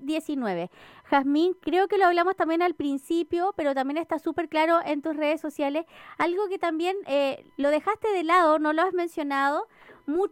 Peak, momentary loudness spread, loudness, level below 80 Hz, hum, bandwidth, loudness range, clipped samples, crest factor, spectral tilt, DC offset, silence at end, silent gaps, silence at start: -8 dBFS; 8 LU; -25 LUFS; -66 dBFS; none; 16 kHz; 2 LU; under 0.1%; 16 dB; -5 dB/octave; under 0.1%; 0.05 s; none; 0 s